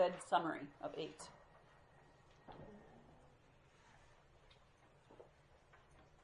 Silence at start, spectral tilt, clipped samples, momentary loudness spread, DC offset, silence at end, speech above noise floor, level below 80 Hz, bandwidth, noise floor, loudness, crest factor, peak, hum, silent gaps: 0 s; -4.5 dB/octave; under 0.1%; 29 LU; under 0.1%; 0.2 s; 26 dB; -74 dBFS; 10.5 kHz; -69 dBFS; -44 LUFS; 26 dB; -20 dBFS; none; none